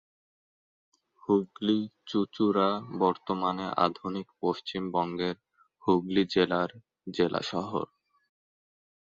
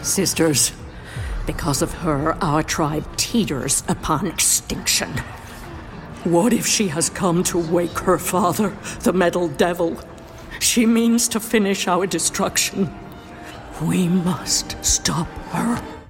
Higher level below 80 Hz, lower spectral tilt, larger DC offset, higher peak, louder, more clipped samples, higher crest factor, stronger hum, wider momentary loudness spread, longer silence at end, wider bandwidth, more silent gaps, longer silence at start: second, -66 dBFS vs -38 dBFS; first, -6.5 dB/octave vs -3.5 dB/octave; neither; second, -8 dBFS vs -4 dBFS; second, -29 LUFS vs -19 LUFS; neither; about the same, 22 dB vs 18 dB; neither; second, 10 LU vs 18 LU; first, 1.15 s vs 0 s; second, 7.6 kHz vs 16.5 kHz; neither; first, 1.3 s vs 0 s